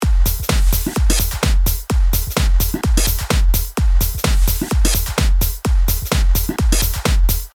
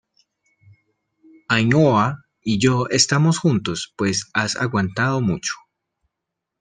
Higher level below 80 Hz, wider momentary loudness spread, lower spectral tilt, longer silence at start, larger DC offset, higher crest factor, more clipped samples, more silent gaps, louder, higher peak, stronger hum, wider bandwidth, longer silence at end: first, -16 dBFS vs -54 dBFS; second, 1 LU vs 10 LU; about the same, -4 dB/octave vs -4.5 dB/octave; second, 0 s vs 1.5 s; neither; second, 14 dB vs 20 dB; neither; neither; about the same, -18 LUFS vs -19 LUFS; about the same, 0 dBFS vs 0 dBFS; neither; first, over 20 kHz vs 10 kHz; second, 0.1 s vs 1.05 s